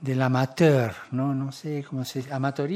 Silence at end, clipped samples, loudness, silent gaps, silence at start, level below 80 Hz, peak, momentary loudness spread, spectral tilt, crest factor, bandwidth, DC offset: 0 s; under 0.1%; -26 LUFS; none; 0 s; -68 dBFS; -6 dBFS; 11 LU; -7 dB/octave; 18 dB; 15 kHz; under 0.1%